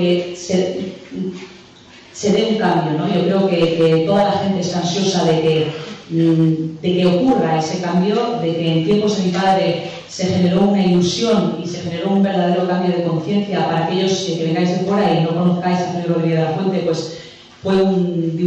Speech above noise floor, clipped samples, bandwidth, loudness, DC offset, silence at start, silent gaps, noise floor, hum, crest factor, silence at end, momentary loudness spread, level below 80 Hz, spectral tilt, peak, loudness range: 26 dB; under 0.1%; 8.4 kHz; -17 LUFS; under 0.1%; 0 s; none; -42 dBFS; none; 10 dB; 0 s; 9 LU; -54 dBFS; -6.5 dB/octave; -6 dBFS; 2 LU